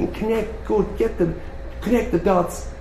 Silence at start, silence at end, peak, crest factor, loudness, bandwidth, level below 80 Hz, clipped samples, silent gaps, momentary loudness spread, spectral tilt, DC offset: 0 s; 0 s; -6 dBFS; 16 dB; -22 LUFS; 13.5 kHz; -32 dBFS; under 0.1%; none; 10 LU; -7 dB/octave; under 0.1%